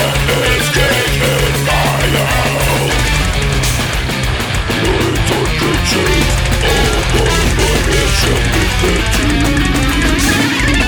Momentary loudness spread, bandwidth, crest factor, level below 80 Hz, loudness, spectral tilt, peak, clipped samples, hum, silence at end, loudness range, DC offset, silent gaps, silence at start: 3 LU; over 20 kHz; 12 dB; -18 dBFS; -13 LUFS; -4 dB/octave; 0 dBFS; under 0.1%; none; 0 s; 2 LU; under 0.1%; none; 0 s